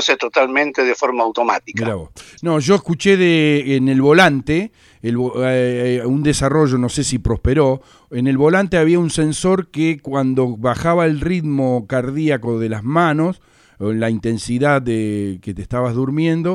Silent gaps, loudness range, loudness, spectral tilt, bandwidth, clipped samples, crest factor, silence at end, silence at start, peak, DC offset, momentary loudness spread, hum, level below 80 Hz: none; 4 LU; -17 LUFS; -6 dB/octave; 12.5 kHz; under 0.1%; 16 dB; 0 s; 0 s; 0 dBFS; under 0.1%; 9 LU; none; -38 dBFS